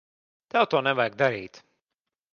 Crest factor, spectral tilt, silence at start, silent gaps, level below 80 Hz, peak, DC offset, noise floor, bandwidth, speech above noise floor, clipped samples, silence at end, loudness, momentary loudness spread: 22 dB; -5.5 dB/octave; 0.55 s; none; -70 dBFS; -6 dBFS; under 0.1%; -87 dBFS; 7 kHz; 63 dB; under 0.1%; 0.75 s; -24 LUFS; 12 LU